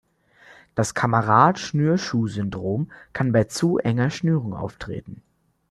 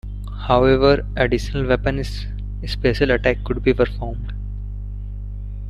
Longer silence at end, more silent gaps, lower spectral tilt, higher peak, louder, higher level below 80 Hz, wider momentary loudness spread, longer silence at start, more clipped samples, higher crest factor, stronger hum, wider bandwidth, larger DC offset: first, 0.55 s vs 0 s; neither; about the same, -6.5 dB/octave vs -7 dB/octave; about the same, -2 dBFS vs -2 dBFS; about the same, -22 LUFS vs -20 LUFS; second, -54 dBFS vs -28 dBFS; about the same, 14 LU vs 16 LU; first, 0.75 s vs 0.05 s; neither; about the same, 20 dB vs 18 dB; second, none vs 50 Hz at -25 dBFS; first, 13 kHz vs 11.5 kHz; neither